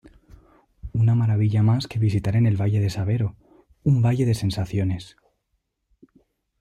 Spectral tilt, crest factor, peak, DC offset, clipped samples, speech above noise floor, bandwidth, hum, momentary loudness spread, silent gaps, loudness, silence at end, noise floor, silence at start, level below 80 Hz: -8 dB/octave; 14 dB; -10 dBFS; under 0.1%; under 0.1%; 54 dB; 10.5 kHz; none; 8 LU; none; -22 LUFS; 1.55 s; -75 dBFS; 0.85 s; -48 dBFS